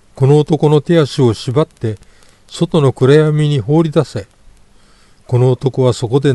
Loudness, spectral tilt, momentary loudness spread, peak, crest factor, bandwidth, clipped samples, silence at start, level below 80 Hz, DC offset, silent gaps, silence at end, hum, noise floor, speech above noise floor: -13 LUFS; -7.5 dB/octave; 13 LU; 0 dBFS; 14 dB; 11.5 kHz; under 0.1%; 0.15 s; -46 dBFS; under 0.1%; none; 0 s; none; -46 dBFS; 34 dB